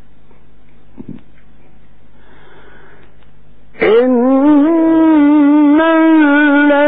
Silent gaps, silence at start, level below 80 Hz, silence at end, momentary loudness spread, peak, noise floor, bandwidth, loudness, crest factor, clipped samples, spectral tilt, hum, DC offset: none; 1 s; -48 dBFS; 0 s; 2 LU; -2 dBFS; -47 dBFS; 4 kHz; -9 LUFS; 10 dB; under 0.1%; -9.5 dB/octave; none; 3%